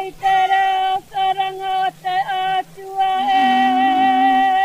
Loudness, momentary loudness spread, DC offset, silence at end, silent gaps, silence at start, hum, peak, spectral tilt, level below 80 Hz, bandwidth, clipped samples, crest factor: -17 LUFS; 7 LU; under 0.1%; 0 s; none; 0 s; none; -6 dBFS; -3.5 dB/octave; -56 dBFS; 15 kHz; under 0.1%; 10 dB